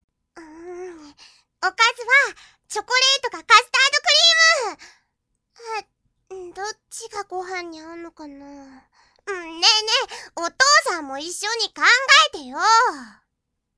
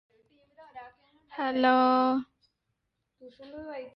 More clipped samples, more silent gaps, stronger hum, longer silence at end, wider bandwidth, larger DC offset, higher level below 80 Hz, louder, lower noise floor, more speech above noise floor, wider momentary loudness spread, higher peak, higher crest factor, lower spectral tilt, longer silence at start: neither; neither; neither; first, 0.7 s vs 0.05 s; first, 11 kHz vs 5.8 kHz; neither; first, -66 dBFS vs -72 dBFS; first, -16 LUFS vs -25 LUFS; about the same, -78 dBFS vs -81 dBFS; first, 58 dB vs 54 dB; second, 23 LU vs 26 LU; first, 0 dBFS vs -12 dBFS; about the same, 22 dB vs 18 dB; second, 2 dB/octave vs -6.5 dB/octave; second, 0.35 s vs 0.6 s